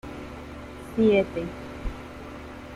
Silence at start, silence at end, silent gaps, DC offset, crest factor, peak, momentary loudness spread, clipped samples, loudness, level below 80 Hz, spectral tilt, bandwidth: 0.05 s; 0 s; none; under 0.1%; 20 dB; -8 dBFS; 19 LU; under 0.1%; -26 LUFS; -42 dBFS; -7 dB/octave; 13 kHz